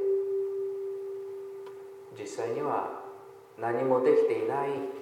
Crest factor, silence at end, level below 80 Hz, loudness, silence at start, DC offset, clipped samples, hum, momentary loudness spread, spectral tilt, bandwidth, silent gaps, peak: 18 dB; 0 s; -84 dBFS; -30 LUFS; 0 s; under 0.1%; under 0.1%; none; 20 LU; -6.5 dB/octave; 12.5 kHz; none; -14 dBFS